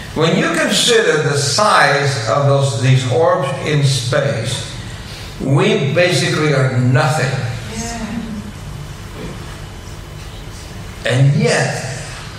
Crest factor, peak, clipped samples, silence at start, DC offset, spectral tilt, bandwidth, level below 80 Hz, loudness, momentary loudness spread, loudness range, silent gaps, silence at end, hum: 16 dB; 0 dBFS; under 0.1%; 0 s; under 0.1%; -4.5 dB/octave; 14.5 kHz; -38 dBFS; -15 LUFS; 19 LU; 12 LU; none; 0 s; none